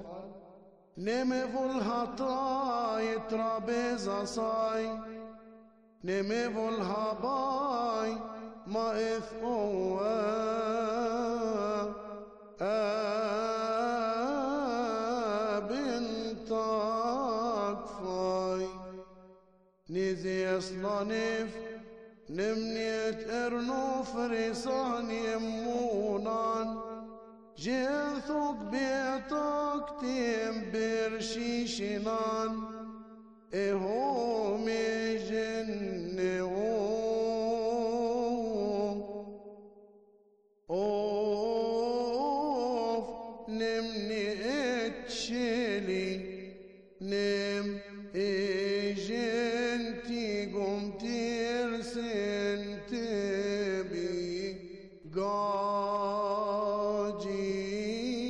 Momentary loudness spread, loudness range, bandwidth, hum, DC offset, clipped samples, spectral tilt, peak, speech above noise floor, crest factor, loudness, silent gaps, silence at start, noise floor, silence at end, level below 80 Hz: 9 LU; 2 LU; 10 kHz; none; under 0.1%; under 0.1%; -5 dB/octave; -22 dBFS; 35 dB; 10 dB; -33 LUFS; none; 0 s; -67 dBFS; 0 s; -62 dBFS